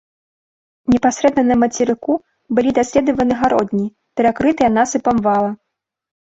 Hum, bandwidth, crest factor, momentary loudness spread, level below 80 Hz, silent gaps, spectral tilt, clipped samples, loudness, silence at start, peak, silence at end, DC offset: none; 8 kHz; 14 dB; 8 LU; -46 dBFS; none; -5.5 dB/octave; under 0.1%; -16 LUFS; 0.9 s; -2 dBFS; 0.85 s; under 0.1%